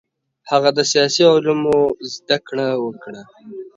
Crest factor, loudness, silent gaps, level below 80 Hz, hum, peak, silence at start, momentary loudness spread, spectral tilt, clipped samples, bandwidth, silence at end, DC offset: 18 dB; -17 LUFS; none; -58 dBFS; none; 0 dBFS; 0.45 s; 22 LU; -3.5 dB/octave; under 0.1%; 7.8 kHz; 0.1 s; under 0.1%